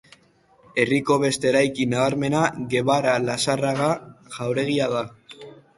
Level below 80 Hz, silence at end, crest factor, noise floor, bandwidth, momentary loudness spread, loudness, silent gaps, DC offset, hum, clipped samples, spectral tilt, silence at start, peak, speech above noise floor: -60 dBFS; 0.25 s; 18 dB; -58 dBFS; 11.5 kHz; 11 LU; -22 LUFS; none; under 0.1%; none; under 0.1%; -5 dB/octave; 0.75 s; -4 dBFS; 36 dB